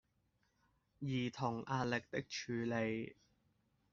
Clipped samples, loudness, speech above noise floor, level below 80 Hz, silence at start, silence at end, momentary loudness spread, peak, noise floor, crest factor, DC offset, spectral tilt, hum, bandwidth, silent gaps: under 0.1%; -41 LUFS; 40 dB; -74 dBFS; 1 s; 0.8 s; 6 LU; -22 dBFS; -80 dBFS; 20 dB; under 0.1%; -5 dB/octave; none; 7.4 kHz; none